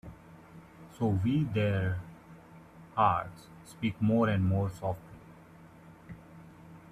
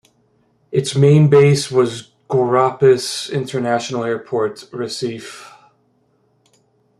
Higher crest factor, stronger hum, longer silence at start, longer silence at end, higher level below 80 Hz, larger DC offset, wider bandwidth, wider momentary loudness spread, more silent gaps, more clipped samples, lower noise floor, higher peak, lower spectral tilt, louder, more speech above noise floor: about the same, 20 dB vs 16 dB; neither; second, 0.05 s vs 0.7 s; second, 0.1 s vs 1.5 s; about the same, -60 dBFS vs -58 dBFS; neither; about the same, 13 kHz vs 12.5 kHz; first, 25 LU vs 15 LU; neither; neither; second, -54 dBFS vs -61 dBFS; second, -12 dBFS vs -2 dBFS; first, -8 dB/octave vs -6 dB/octave; second, -31 LUFS vs -16 LUFS; second, 25 dB vs 45 dB